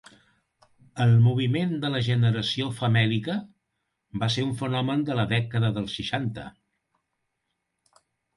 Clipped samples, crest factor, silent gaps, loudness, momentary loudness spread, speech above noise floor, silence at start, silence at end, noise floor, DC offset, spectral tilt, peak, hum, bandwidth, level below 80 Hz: under 0.1%; 16 dB; none; -25 LUFS; 12 LU; 55 dB; 0.95 s; 1.85 s; -80 dBFS; under 0.1%; -6.5 dB/octave; -10 dBFS; none; 11.5 kHz; -56 dBFS